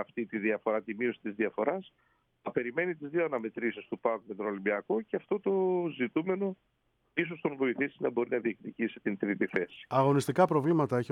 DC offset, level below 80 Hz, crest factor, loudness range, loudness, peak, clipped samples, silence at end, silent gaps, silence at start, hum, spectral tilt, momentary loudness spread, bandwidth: under 0.1%; -76 dBFS; 20 dB; 4 LU; -32 LUFS; -12 dBFS; under 0.1%; 0.05 s; none; 0 s; none; -7 dB/octave; 9 LU; 13.5 kHz